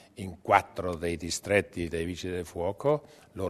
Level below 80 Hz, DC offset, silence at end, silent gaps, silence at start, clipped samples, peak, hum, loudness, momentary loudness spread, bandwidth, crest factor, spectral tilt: -52 dBFS; under 0.1%; 0 s; none; 0.15 s; under 0.1%; -4 dBFS; none; -30 LUFS; 10 LU; 13.5 kHz; 26 dB; -4.5 dB/octave